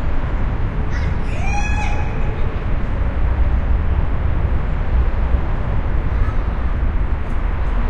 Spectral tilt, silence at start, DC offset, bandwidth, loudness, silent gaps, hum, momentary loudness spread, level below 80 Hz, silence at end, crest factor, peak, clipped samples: -7.5 dB/octave; 0 s; under 0.1%; 7.2 kHz; -22 LUFS; none; none; 3 LU; -18 dBFS; 0 s; 12 dB; -4 dBFS; under 0.1%